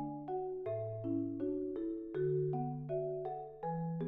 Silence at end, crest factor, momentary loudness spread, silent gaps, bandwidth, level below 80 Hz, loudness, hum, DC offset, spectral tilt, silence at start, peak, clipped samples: 0 s; 12 dB; 5 LU; none; 3.9 kHz; -66 dBFS; -39 LUFS; none; under 0.1%; -10.5 dB/octave; 0 s; -26 dBFS; under 0.1%